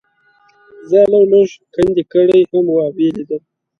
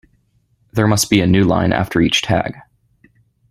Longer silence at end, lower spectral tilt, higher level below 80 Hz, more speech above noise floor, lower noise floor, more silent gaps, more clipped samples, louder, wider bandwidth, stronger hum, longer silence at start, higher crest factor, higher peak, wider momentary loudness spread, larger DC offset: second, 0.4 s vs 0.9 s; first, -7.5 dB/octave vs -5 dB/octave; second, -50 dBFS vs -42 dBFS; second, 42 dB vs 46 dB; second, -54 dBFS vs -60 dBFS; neither; neither; about the same, -13 LUFS vs -15 LUFS; second, 7 kHz vs 14 kHz; neither; about the same, 0.85 s vs 0.75 s; about the same, 14 dB vs 16 dB; about the same, 0 dBFS vs -2 dBFS; first, 10 LU vs 6 LU; neither